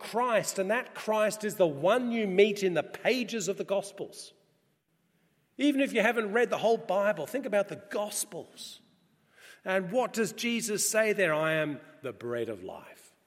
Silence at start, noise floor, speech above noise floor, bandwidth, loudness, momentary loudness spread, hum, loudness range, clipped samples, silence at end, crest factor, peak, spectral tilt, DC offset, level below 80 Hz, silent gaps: 0 s; -73 dBFS; 44 dB; 16.5 kHz; -29 LUFS; 16 LU; none; 5 LU; under 0.1%; 0.3 s; 20 dB; -10 dBFS; -3.5 dB/octave; under 0.1%; -84 dBFS; none